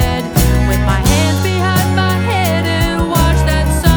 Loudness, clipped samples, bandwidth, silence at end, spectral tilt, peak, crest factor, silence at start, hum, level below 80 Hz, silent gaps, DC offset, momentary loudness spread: -13 LUFS; under 0.1%; over 20 kHz; 0 s; -5 dB/octave; 0 dBFS; 12 dB; 0 s; none; -18 dBFS; none; under 0.1%; 2 LU